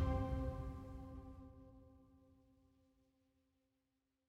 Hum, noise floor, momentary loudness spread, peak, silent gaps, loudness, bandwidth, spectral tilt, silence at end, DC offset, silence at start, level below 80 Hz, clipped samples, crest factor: none; -87 dBFS; 24 LU; -28 dBFS; none; -46 LUFS; 8.4 kHz; -9 dB/octave; 2.05 s; under 0.1%; 0 s; -52 dBFS; under 0.1%; 20 dB